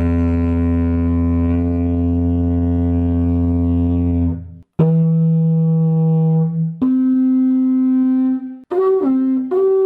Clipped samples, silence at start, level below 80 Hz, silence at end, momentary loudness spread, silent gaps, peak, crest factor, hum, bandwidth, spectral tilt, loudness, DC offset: under 0.1%; 0 s; -30 dBFS; 0 s; 4 LU; none; -2 dBFS; 12 dB; none; 3.1 kHz; -12.5 dB/octave; -16 LUFS; under 0.1%